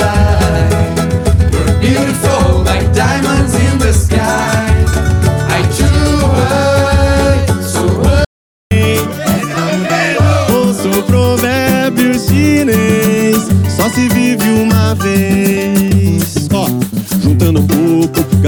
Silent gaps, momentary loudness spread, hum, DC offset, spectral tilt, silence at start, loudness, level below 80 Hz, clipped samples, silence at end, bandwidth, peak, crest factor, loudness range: 8.26-8.70 s; 3 LU; none; under 0.1%; -6 dB/octave; 0 s; -11 LUFS; -20 dBFS; under 0.1%; 0 s; over 20 kHz; 0 dBFS; 10 dB; 2 LU